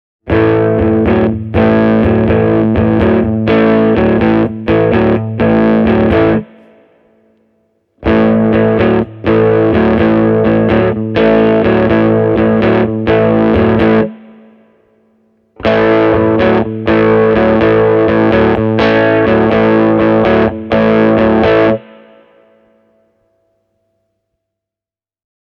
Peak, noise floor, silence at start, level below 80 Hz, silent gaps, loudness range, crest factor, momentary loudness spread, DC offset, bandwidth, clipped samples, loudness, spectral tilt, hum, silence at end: 0 dBFS; -89 dBFS; 0.25 s; -32 dBFS; none; 4 LU; 10 dB; 4 LU; under 0.1%; 5.8 kHz; under 0.1%; -10 LUFS; -9.5 dB/octave; none; 3.6 s